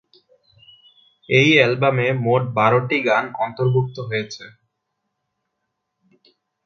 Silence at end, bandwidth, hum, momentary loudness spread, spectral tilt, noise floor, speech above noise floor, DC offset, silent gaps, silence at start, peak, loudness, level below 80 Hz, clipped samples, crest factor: 2.15 s; 7 kHz; none; 12 LU; -6 dB/octave; -77 dBFS; 58 dB; under 0.1%; none; 1.3 s; 0 dBFS; -18 LUFS; -62 dBFS; under 0.1%; 20 dB